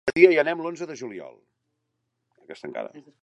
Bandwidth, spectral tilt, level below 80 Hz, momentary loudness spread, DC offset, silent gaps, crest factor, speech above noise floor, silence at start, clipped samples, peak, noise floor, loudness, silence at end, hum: 8 kHz; -5.5 dB/octave; -68 dBFS; 23 LU; under 0.1%; none; 24 dB; 55 dB; 0.05 s; under 0.1%; -2 dBFS; -78 dBFS; -22 LUFS; 0.25 s; none